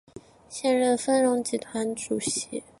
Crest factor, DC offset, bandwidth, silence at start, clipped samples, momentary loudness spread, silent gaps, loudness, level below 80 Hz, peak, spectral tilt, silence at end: 16 dB; under 0.1%; 11.5 kHz; 0.15 s; under 0.1%; 8 LU; none; -26 LUFS; -64 dBFS; -10 dBFS; -3 dB/octave; 0.2 s